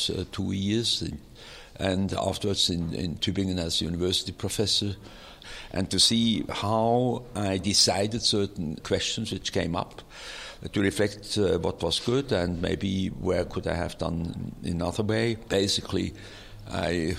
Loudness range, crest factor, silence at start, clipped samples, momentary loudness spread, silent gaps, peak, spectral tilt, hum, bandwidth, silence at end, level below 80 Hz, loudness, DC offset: 5 LU; 20 dB; 0 s; under 0.1%; 15 LU; none; -8 dBFS; -4 dB/octave; none; 16 kHz; 0 s; -48 dBFS; -27 LUFS; under 0.1%